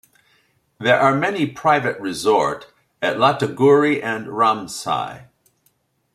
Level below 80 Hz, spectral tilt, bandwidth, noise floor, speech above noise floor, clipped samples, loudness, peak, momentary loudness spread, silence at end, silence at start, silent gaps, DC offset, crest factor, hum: -62 dBFS; -5 dB/octave; 14.5 kHz; -65 dBFS; 46 dB; under 0.1%; -18 LUFS; -2 dBFS; 10 LU; 0.9 s; 0.8 s; none; under 0.1%; 18 dB; none